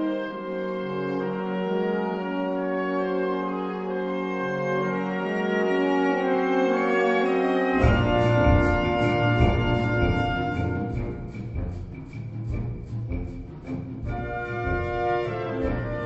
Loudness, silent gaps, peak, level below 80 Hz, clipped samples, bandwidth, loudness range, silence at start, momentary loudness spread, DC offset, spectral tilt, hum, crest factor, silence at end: -25 LUFS; none; -6 dBFS; -36 dBFS; under 0.1%; 8 kHz; 10 LU; 0 s; 12 LU; under 0.1%; -8 dB/octave; none; 18 dB; 0 s